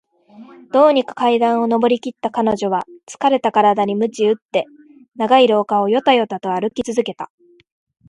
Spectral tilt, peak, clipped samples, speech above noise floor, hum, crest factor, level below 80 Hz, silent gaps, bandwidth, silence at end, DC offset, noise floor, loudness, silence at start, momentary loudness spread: -5 dB/octave; 0 dBFS; under 0.1%; 26 dB; none; 16 dB; -60 dBFS; 4.42-4.49 s; 11.5 kHz; 0.85 s; under 0.1%; -43 dBFS; -17 LUFS; 0.4 s; 10 LU